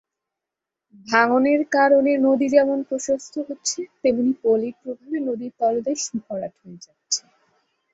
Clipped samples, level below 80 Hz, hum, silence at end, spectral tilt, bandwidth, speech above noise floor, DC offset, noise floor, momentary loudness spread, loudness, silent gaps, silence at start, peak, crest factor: under 0.1%; -66 dBFS; none; 0.75 s; -3 dB/octave; 8 kHz; 65 dB; under 0.1%; -86 dBFS; 13 LU; -21 LUFS; none; 1.05 s; -2 dBFS; 20 dB